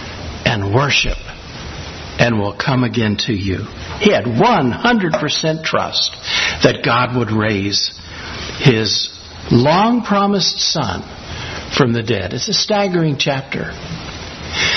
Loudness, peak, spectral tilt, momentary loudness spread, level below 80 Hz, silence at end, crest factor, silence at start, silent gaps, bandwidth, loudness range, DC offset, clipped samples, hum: -16 LUFS; 0 dBFS; -4.5 dB/octave; 14 LU; -38 dBFS; 0 s; 16 dB; 0 s; none; 6.4 kHz; 3 LU; under 0.1%; under 0.1%; none